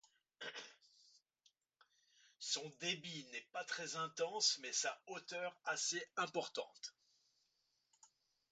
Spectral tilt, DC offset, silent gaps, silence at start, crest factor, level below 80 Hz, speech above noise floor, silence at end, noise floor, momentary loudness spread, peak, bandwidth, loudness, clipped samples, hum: -1 dB/octave; under 0.1%; none; 0.4 s; 24 dB; under -90 dBFS; 40 dB; 0.45 s; -84 dBFS; 15 LU; -22 dBFS; 9 kHz; -42 LUFS; under 0.1%; none